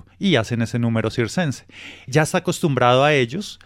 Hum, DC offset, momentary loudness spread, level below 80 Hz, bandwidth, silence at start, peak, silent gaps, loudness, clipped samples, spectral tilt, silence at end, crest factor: none; under 0.1%; 10 LU; -52 dBFS; 16 kHz; 0.2 s; -4 dBFS; none; -19 LUFS; under 0.1%; -5.5 dB/octave; 0.1 s; 16 dB